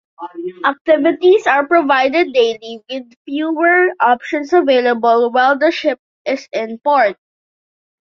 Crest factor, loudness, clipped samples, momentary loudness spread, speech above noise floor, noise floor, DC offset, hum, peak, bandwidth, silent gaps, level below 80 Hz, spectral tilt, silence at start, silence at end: 14 dB; -14 LUFS; under 0.1%; 15 LU; over 76 dB; under -90 dBFS; under 0.1%; none; -2 dBFS; 7.4 kHz; 0.81-0.85 s, 3.16-3.25 s, 5.99-6.25 s; -64 dBFS; -4 dB/octave; 0.2 s; 1 s